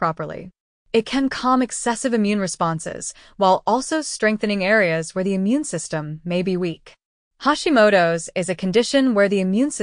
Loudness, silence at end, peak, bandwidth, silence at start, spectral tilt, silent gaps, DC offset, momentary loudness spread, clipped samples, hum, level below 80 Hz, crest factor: -20 LUFS; 0 s; -4 dBFS; 10.5 kHz; 0 s; -4.5 dB/octave; 0.60-0.86 s, 7.05-7.31 s; under 0.1%; 11 LU; under 0.1%; none; -54 dBFS; 16 dB